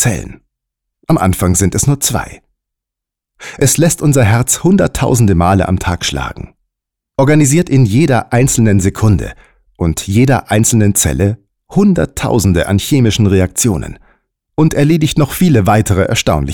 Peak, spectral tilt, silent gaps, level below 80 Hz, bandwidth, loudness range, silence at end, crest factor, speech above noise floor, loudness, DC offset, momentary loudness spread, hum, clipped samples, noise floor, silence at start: -2 dBFS; -5.5 dB/octave; none; -30 dBFS; over 20 kHz; 2 LU; 0 s; 10 dB; 71 dB; -12 LUFS; under 0.1%; 11 LU; none; under 0.1%; -82 dBFS; 0 s